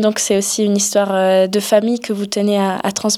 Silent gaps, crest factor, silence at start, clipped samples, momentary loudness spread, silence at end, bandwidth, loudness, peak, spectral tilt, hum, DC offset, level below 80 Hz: none; 14 dB; 0 s; under 0.1%; 5 LU; 0 s; 16 kHz; -16 LUFS; 0 dBFS; -3.5 dB/octave; none; under 0.1%; -60 dBFS